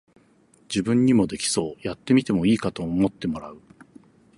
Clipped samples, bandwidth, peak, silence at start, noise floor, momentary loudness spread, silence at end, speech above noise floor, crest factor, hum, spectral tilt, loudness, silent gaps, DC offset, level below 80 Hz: under 0.1%; 11.5 kHz; -8 dBFS; 0.7 s; -58 dBFS; 11 LU; 0.8 s; 36 dB; 16 dB; none; -5.5 dB/octave; -23 LUFS; none; under 0.1%; -52 dBFS